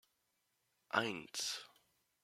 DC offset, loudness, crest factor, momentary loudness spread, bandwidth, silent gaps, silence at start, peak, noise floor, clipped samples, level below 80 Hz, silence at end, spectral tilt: under 0.1%; -40 LUFS; 28 dB; 9 LU; 16.5 kHz; none; 0.95 s; -16 dBFS; -83 dBFS; under 0.1%; -86 dBFS; 0.55 s; -2 dB/octave